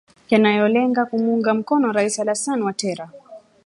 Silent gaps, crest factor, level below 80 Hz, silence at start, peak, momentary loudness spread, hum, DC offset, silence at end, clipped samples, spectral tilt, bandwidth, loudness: none; 18 dB; -68 dBFS; 0.3 s; -2 dBFS; 9 LU; none; under 0.1%; 0.3 s; under 0.1%; -4.5 dB/octave; 11.5 kHz; -19 LUFS